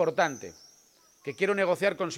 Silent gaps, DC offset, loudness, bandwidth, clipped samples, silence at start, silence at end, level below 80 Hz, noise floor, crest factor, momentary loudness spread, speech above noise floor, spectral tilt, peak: none; under 0.1%; -27 LUFS; 16.5 kHz; under 0.1%; 0 s; 0 s; -74 dBFS; -61 dBFS; 18 dB; 16 LU; 33 dB; -4.5 dB/octave; -10 dBFS